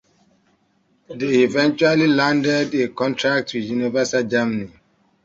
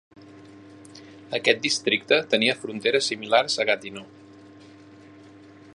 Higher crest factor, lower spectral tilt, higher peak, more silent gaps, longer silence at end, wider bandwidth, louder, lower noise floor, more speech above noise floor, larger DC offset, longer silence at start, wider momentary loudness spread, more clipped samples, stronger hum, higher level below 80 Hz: second, 16 dB vs 24 dB; first, -5 dB/octave vs -2.5 dB/octave; about the same, -4 dBFS vs -2 dBFS; neither; second, 0.55 s vs 1.7 s; second, 7.8 kHz vs 11.5 kHz; first, -19 LUFS vs -22 LUFS; first, -63 dBFS vs -48 dBFS; first, 44 dB vs 25 dB; neither; first, 1.1 s vs 0.2 s; second, 9 LU vs 17 LU; neither; neither; first, -60 dBFS vs -70 dBFS